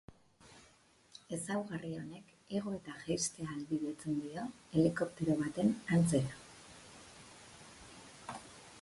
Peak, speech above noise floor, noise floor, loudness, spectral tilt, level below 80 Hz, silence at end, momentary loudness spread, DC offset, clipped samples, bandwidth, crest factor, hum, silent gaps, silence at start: -16 dBFS; 30 dB; -66 dBFS; -37 LUFS; -5.5 dB/octave; -66 dBFS; 0 s; 22 LU; under 0.1%; under 0.1%; 11.5 kHz; 22 dB; none; none; 0.1 s